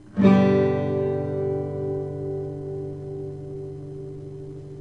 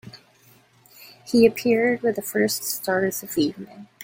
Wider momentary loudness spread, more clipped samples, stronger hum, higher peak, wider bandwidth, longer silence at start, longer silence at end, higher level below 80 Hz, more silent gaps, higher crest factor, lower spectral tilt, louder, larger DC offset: first, 19 LU vs 12 LU; neither; neither; about the same, -6 dBFS vs -4 dBFS; second, 6.4 kHz vs 17 kHz; about the same, 0 s vs 0.05 s; about the same, 0 s vs 0 s; first, -56 dBFS vs -62 dBFS; neither; about the same, 20 dB vs 20 dB; first, -9.5 dB/octave vs -4 dB/octave; about the same, -24 LUFS vs -22 LUFS; first, 0.2% vs under 0.1%